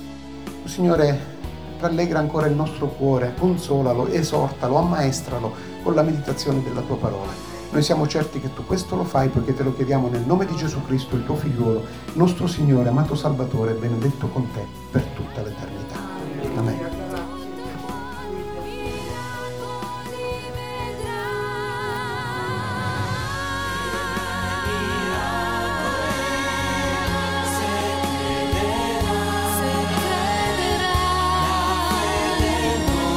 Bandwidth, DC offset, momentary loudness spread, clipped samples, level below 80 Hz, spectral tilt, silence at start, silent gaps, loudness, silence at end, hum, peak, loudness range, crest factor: over 20 kHz; 0.5%; 11 LU; under 0.1%; -38 dBFS; -5.5 dB/octave; 0 s; none; -23 LUFS; 0 s; none; -2 dBFS; 8 LU; 20 dB